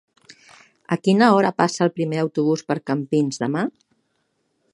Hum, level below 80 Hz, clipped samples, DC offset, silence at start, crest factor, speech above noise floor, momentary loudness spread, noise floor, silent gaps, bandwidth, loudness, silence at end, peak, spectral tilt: none; -70 dBFS; under 0.1%; under 0.1%; 0.9 s; 20 dB; 51 dB; 9 LU; -70 dBFS; none; 11.5 kHz; -20 LUFS; 1.05 s; 0 dBFS; -6 dB/octave